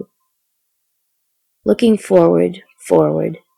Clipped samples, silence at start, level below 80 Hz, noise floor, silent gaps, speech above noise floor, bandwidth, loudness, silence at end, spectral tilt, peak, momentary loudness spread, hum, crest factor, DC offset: under 0.1%; 0 s; -56 dBFS; -70 dBFS; none; 57 dB; 13.5 kHz; -15 LUFS; 0.2 s; -7 dB/octave; 0 dBFS; 10 LU; none; 16 dB; under 0.1%